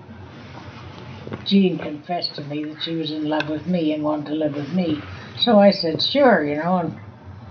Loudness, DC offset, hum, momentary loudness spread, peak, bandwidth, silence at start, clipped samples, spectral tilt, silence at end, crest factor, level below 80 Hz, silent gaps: -21 LUFS; under 0.1%; none; 22 LU; -4 dBFS; 6.6 kHz; 0 s; under 0.1%; -7.5 dB/octave; 0 s; 18 dB; -60 dBFS; none